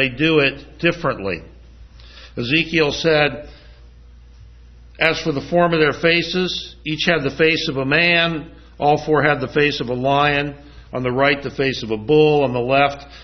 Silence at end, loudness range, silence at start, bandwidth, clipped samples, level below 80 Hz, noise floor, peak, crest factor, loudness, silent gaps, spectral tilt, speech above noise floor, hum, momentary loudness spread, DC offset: 0 s; 4 LU; 0 s; 6.4 kHz; under 0.1%; -44 dBFS; -43 dBFS; 0 dBFS; 18 dB; -18 LUFS; none; -5.5 dB/octave; 25 dB; none; 10 LU; under 0.1%